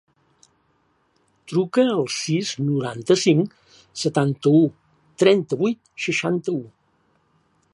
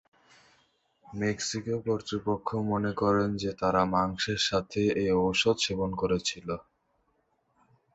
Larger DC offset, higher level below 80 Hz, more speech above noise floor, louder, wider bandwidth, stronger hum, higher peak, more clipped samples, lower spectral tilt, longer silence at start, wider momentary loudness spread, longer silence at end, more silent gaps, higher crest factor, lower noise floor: neither; second, -68 dBFS vs -54 dBFS; about the same, 45 dB vs 45 dB; first, -21 LUFS vs -29 LUFS; first, 11.5 kHz vs 8.2 kHz; neither; first, -2 dBFS vs -10 dBFS; neither; about the same, -5.5 dB/octave vs -4.5 dB/octave; first, 1.5 s vs 1.1 s; about the same, 9 LU vs 7 LU; second, 1.05 s vs 1.35 s; neither; about the same, 20 dB vs 20 dB; second, -65 dBFS vs -73 dBFS